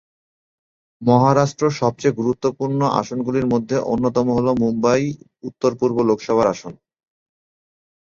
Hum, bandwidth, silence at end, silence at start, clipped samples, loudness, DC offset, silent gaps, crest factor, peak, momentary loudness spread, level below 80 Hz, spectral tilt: none; 7.6 kHz; 1.4 s; 1 s; under 0.1%; -19 LUFS; under 0.1%; none; 18 dB; -2 dBFS; 6 LU; -52 dBFS; -7 dB/octave